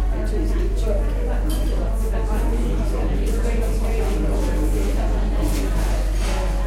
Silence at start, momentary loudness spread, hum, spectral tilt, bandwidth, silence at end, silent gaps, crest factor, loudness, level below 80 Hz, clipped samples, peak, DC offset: 0 s; 1 LU; none; -6.5 dB/octave; 14 kHz; 0 s; none; 10 dB; -23 LUFS; -20 dBFS; under 0.1%; -10 dBFS; under 0.1%